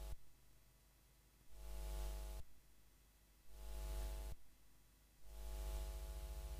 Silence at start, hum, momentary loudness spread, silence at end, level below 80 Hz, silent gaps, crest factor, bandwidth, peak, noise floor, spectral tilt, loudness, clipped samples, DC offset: 0 s; none; 13 LU; 0 s; -52 dBFS; none; 14 dB; 15.5 kHz; -36 dBFS; -71 dBFS; -4.5 dB/octave; -53 LUFS; under 0.1%; under 0.1%